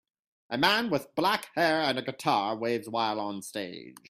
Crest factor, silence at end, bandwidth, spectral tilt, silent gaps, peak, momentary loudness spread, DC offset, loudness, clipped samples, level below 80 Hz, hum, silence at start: 24 dB; 0.2 s; 15.5 kHz; -4 dB/octave; none; -6 dBFS; 12 LU; under 0.1%; -28 LUFS; under 0.1%; -70 dBFS; none; 0.5 s